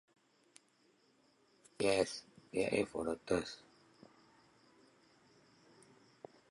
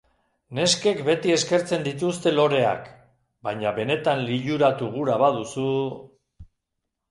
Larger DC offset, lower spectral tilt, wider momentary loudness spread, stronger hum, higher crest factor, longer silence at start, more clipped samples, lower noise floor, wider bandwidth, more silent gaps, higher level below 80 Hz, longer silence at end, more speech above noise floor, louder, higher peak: neither; about the same, -4.5 dB/octave vs -4.5 dB/octave; first, 24 LU vs 10 LU; neither; first, 24 dB vs 18 dB; first, 1.8 s vs 0.5 s; neither; second, -73 dBFS vs -81 dBFS; about the same, 11.5 kHz vs 11.5 kHz; neither; second, -70 dBFS vs -60 dBFS; first, 2.95 s vs 0.65 s; second, 36 dB vs 58 dB; second, -38 LUFS vs -23 LUFS; second, -18 dBFS vs -6 dBFS